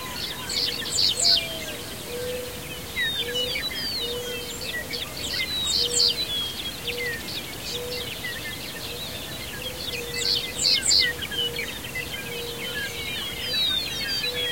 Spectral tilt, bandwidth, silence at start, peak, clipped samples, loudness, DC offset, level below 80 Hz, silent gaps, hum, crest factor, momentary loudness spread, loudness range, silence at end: -1 dB/octave; 16.5 kHz; 0 s; -6 dBFS; under 0.1%; -25 LUFS; 0.4%; -48 dBFS; none; none; 22 dB; 13 LU; 5 LU; 0 s